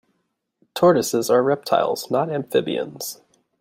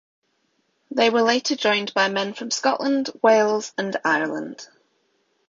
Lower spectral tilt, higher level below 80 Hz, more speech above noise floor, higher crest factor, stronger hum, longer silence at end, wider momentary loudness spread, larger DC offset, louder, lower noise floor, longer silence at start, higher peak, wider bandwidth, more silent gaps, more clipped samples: first, -4.5 dB/octave vs -3 dB/octave; about the same, -66 dBFS vs -70 dBFS; first, 54 dB vs 48 dB; about the same, 18 dB vs 18 dB; neither; second, 0.45 s vs 0.85 s; first, 15 LU vs 10 LU; neither; about the same, -20 LUFS vs -21 LUFS; first, -74 dBFS vs -69 dBFS; second, 0.75 s vs 0.9 s; about the same, -4 dBFS vs -4 dBFS; first, 16.5 kHz vs 7.6 kHz; neither; neither